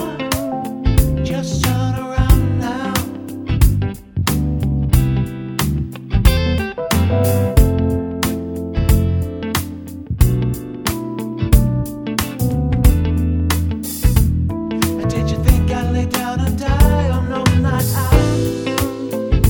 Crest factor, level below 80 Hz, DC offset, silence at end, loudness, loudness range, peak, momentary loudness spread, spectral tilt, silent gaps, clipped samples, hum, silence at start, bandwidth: 16 dB; -20 dBFS; under 0.1%; 0 s; -18 LUFS; 2 LU; 0 dBFS; 7 LU; -6 dB/octave; none; under 0.1%; none; 0 s; over 20 kHz